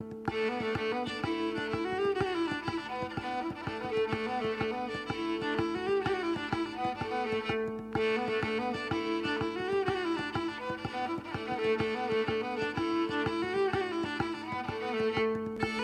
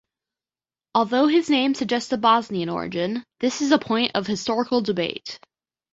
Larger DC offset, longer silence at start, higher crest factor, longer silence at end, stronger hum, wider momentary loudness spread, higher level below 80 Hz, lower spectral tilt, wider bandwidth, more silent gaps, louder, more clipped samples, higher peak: neither; second, 0 s vs 0.95 s; about the same, 16 dB vs 20 dB; second, 0 s vs 0.55 s; neither; second, 5 LU vs 8 LU; about the same, -60 dBFS vs -62 dBFS; first, -6 dB/octave vs -4.5 dB/octave; first, 11.5 kHz vs 8 kHz; neither; second, -33 LUFS vs -22 LUFS; neither; second, -16 dBFS vs -4 dBFS